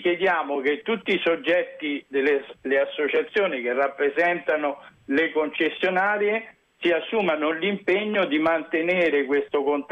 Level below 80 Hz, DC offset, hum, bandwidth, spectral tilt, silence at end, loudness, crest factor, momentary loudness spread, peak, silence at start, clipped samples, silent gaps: -68 dBFS; under 0.1%; none; 7.4 kHz; -6.5 dB/octave; 0.05 s; -23 LUFS; 12 dB; 4 LU; -12 dBFS; 0 s; under 0.1%; none